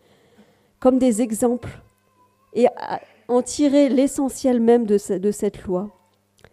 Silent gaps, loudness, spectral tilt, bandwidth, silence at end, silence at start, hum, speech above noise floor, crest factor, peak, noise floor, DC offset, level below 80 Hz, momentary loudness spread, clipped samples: none; -20 LUFS; -5.5 dB/octave; 14 kHz; 0.65 s; 0.8 s; none; 41 dB; 18 dB; -4 dBFS; -60 dBFS; under 0.1%; -54 dBFS; 13 LU; under 0.1%